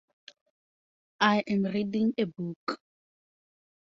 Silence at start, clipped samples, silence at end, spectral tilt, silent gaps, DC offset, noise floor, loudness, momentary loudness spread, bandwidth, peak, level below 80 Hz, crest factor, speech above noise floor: 1.2 s; under 0.1%; 1.25 s; -6.5 dB/octave; 2.56-2.67 s; under 0.1%; under -90 dBFS; -29 LUFS; 12 LU; 7.6 kHz; -8 dBFS; -72 dBFS; 24 dB; over 62 dB